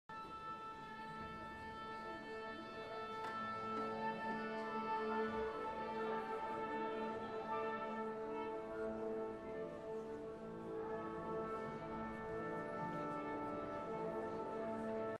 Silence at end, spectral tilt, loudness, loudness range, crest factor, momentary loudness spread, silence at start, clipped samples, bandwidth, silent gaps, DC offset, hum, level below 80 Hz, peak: 0 s; -6.5 dB/octave; -45 LUFS; 4 LU; 16 dB; 7 LU; 0.1 s; under 0.1%; 12 kHz; none; under 0.1%; none; -70 dBFS; -30 dBFS